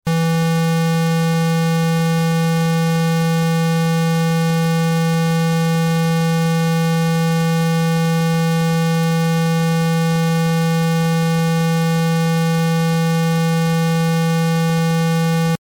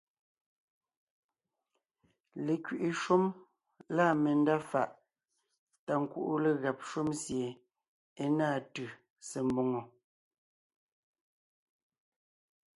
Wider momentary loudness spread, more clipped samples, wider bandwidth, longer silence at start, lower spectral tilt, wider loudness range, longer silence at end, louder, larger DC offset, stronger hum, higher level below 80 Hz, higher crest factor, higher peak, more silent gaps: second, 0 LU vs 15 LU; neither; first, 17 kHz vs 11.5 kHz; second, 0.05 s vs 2.35 s; about the same, -6 dB/octave vs -6 dB/octave; second, 0 LU vs 8 LU; second, 0.05 s vs 2.9 s; first, -17 LUFS vs -33 LUFS; neither; neither; first, -54 dBFS vs -74 dBFS; second, 4 dB vs 20 dB; first, -12 dBFS vs -16 dBFS; second, none vs 5.58-5.67 s, 5.79-5.87 s, 7.88-8.16 s, 9.10-9.16 s